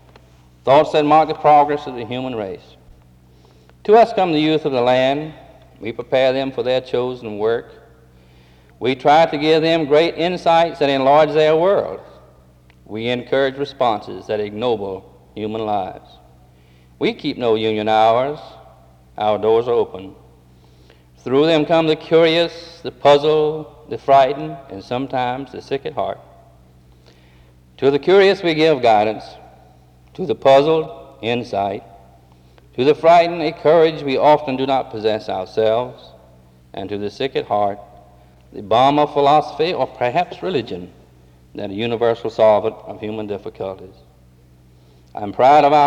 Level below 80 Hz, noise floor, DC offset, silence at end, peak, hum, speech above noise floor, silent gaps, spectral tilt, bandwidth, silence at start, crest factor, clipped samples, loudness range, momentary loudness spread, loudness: -52 dBFS; -49 dBFS; under 0.1%; 0 s; -4 dBFS; none; 32 dB; none; -6 dB/octave; 9.4 kHz; 0.65 s; 14 dB; under 0.1%; 6 LU; 17 LU; -17 LUFS